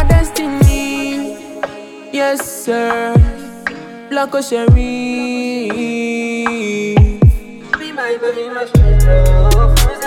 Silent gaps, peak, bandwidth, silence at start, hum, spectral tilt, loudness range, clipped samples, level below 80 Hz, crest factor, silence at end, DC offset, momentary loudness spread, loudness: none; 0 dBFS; 16.5 kHz; 0 s; none; -6 dB/octave; 4 LU; under 0.1%; -16 dBFS; 12 dB; 0 s; under 0.1%; 12 LU; -15 LUFS